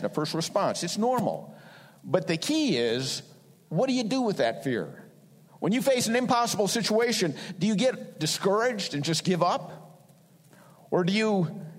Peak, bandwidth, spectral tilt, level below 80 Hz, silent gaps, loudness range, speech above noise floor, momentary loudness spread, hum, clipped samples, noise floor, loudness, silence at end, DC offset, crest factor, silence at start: -8 dBFS; 16 kHz; -4.5 dB/octave; -72 dBFS; none; 3 LU; 30 dB; 8 LU; none; under 0.1%; -57 dBFS; -27 LUFS; 0 s; under 0.1%; 18 dB; 0 s